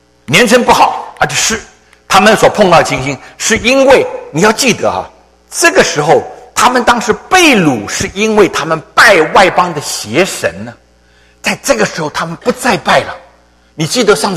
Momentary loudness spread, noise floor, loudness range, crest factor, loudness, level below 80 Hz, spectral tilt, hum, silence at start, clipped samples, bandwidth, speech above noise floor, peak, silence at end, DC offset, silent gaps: 11 LU; -46 dBFS; 6 LU; 10 dB; -9 LUFS; -40 dBFS; -3 dB/octave; none; 0.3 s; 0.7%; 16 kHz; 37 dB; 0 dBFS; 0 s; under 0.1%; none